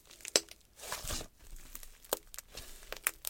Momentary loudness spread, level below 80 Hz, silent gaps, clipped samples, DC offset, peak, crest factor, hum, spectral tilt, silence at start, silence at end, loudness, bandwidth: 18 LU; -52 dBFS; none; under 0.1%; under 0.1%; -6 dBFS; 34 dB; none; -0.5 dB/octave; 0.05 s; 0 s; -37 LUFS; 17 kHz